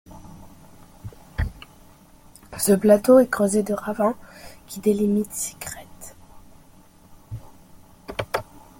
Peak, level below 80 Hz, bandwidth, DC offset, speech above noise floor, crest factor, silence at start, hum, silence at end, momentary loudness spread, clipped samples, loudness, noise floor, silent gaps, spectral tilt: -4 dBFS; -44 dBFS; 17 kHz; under 0.1%; 31 dB; 20 dB; 0.1 s; none; 0.35 s; 27 LU; under 0.1%; -21 LUFS; -51 dBFS; none; -5.5 dB/octave